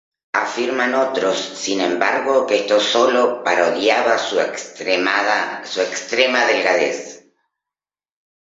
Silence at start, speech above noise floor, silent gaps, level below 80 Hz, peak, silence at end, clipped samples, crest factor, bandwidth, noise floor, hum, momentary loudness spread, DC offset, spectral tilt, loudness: 0.35 s; over 72 dB; none; -70 dBFS; 0 dBFS; 1.3 s; under 0.1%; 18 dB; 8 kHz; under -90 dBFS; none; 7 LU; under 0.1%; -2 dB/octave; -18 LUFS